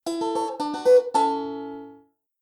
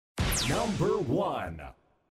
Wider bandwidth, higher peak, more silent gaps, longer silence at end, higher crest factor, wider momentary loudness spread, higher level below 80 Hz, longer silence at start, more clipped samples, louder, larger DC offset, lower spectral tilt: second, 13 kHz vs 15.5 kHz; first, -8 dBFS vs -16 dBFS; neither; about the same, 0.45 s vs 0.45 s; about the same, 16 dB vs 14 dB; first, 18 LU vs 14 LU; second, -74 dBFS vs -42 dBFS; about the same, 0.05 s vs 0.15 s; neither; first, -23 LUFS vs -29 LUFS; neither; about the same, -4 dB/octave vs -4.5 dB/octave